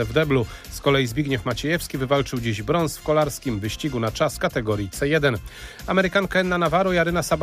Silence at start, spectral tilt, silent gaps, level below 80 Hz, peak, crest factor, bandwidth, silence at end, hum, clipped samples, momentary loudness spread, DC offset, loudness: 0 s; -5 dB/octave; none; -40 dBFS; -6 dBFS; 16 dB; 15.5 kHz; 0 s; none; under 0.1%; 6 LU; under 0.1%; -22 LUFS